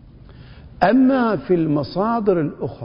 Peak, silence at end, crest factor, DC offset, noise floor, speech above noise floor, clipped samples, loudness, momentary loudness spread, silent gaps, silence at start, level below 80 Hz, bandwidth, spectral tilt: 0 dBFS; 0 s; 20 dB; under 0.1%; -42 dBFS; 24 dB; under 0.1%; -18 LUFS; 6 LU; none; 0.3 s; -46 dBFS; 5.4 kHz; -10 dB/octave